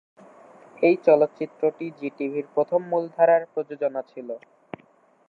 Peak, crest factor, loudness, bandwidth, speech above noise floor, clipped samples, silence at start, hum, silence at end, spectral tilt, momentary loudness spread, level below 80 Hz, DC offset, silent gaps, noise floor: -4 dBFS; 20 dB; -23 LUFS; 5.8 kHz; 36 dB; under 0.1%; 0.8 s; none; 0.9 s; -8.5 dB/octave; 20 LU; -82 dBFS; under 0.1%; none; -59 dBFS